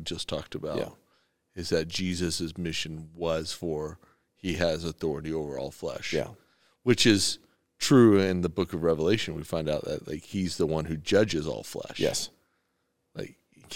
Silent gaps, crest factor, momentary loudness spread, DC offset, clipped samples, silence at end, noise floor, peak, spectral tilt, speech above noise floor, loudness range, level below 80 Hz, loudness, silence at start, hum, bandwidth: none; 22 dB; 16 LU; 0.2%; under 0.1%; 0 s; -76 dBFS; -8 dBFS; -4.5 dB/octave; 49 dB; 8 LU; -56 dBFS; -28 LUFS; 0 s; none; 17 kHz